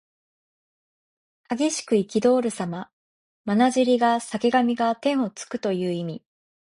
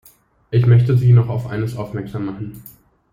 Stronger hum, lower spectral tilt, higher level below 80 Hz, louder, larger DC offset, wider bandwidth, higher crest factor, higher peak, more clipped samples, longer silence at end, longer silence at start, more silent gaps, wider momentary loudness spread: neither; second, -5 dB/octave vs -9 dB/octave; second, -66 dBFS vs -48 dBFS; second, -23 LUFS vs -17 LUFS; neither; second, 11.5 kHz vs 15.5 kHz; about the same, 18 dB vs 14 dB; about the same, -6 dBFS vs -4 dBFS; neither; first, 0.6 s vs 0.45 s; first, 1.5 s vs 0.5 s; first, 2.93-3.44 s vs none; about the same, 13 LU vs 14 LU